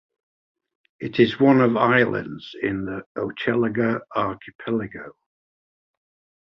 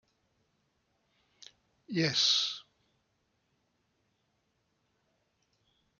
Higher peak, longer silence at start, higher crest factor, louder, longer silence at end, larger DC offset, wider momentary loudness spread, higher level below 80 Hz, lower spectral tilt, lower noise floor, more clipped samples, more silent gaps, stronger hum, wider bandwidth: first, -4 dBFS vs -14 dBFS; second, 1 s vs 1.9 s; about the same, 20 dB vs 24 dB; first, -22 LUFS vs -28 LUFS; second, 1.45 s vs 3.4 s; neither; first, 18 LU vs 13 LU; first, -58 dBFS vs -82 dBFS; first, -8.5 dB/octave vs -2.5 dB/octave; first, under -90 dBFS vs -78 dBFS; neither; first, 3.06-3.15 s, 4.55-4.59 s vs none; neither; second, 6.2 kHz vs 12.5 kHz